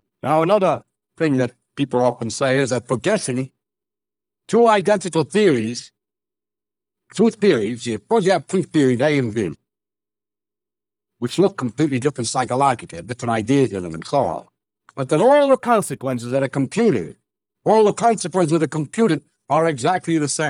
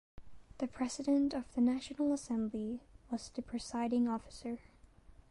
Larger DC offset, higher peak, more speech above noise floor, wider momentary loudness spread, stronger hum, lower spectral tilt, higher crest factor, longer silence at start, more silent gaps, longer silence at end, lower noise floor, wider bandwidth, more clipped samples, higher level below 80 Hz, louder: neither; first, -4 dBFS vs -22 dBFS; first, over 72 dB vs 24 dB; about the same, 11 LU vs 12 LU; neither; about the same, -5.5 dB/octave vs -5 dB/octave; about the same, 16 dB vs 14 dB; about the same, 0.25 s vs 0.15 s; neither; second, 0 s vs 0.2 s; first, under -90 dBFS vs -60 dBFS; first, 15 kHz vs 11.5 kHz; neither; about the same, -62 dBFS vs -62 dBFS; first, -19 LUFS vs -37 LUFS